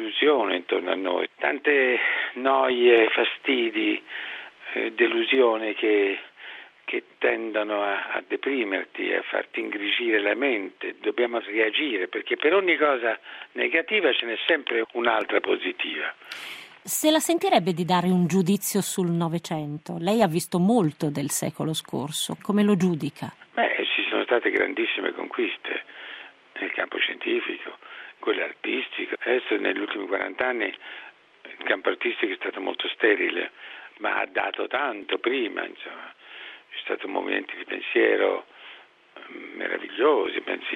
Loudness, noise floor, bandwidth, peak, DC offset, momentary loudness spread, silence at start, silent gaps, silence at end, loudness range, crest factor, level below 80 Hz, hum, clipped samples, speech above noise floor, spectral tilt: -25 LUFS; -49 dBFS; 14.5 kHz; -4 dBFS; under 0.1%; 15 LU; 0 s; none; 0 s; 6 LU; 20 dB; -74 dBFS; none; under 0.1%; 24 dB; -4.5 dB/octave